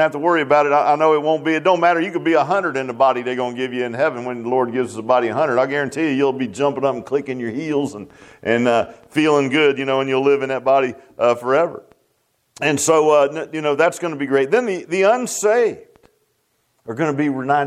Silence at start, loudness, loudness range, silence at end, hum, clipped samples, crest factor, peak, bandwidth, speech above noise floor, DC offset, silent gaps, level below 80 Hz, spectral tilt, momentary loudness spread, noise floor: 0 s; -18 LUFS; 3 LU; 0 s; none; under 0.1%; 16 dB; -2 dBFS; 15 kHz; 48 dB; under 0.1%; none; -66 dBFS; -4.5 dB/octave; 8 LU; -66 dBFS